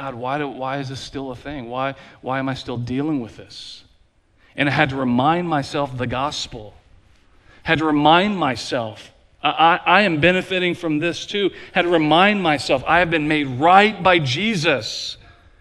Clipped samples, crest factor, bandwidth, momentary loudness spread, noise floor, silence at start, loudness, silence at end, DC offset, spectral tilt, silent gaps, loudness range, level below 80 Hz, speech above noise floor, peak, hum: under 0.1%; 20 dB; 12 kHz; 16 LU; -57 dBFS; 0 s; -19 LUFS; 0.45 s; under 0.1%; -5 dB/octave; none; 10 LU; -48 dBFS; 38 dB; 0 dBFS; none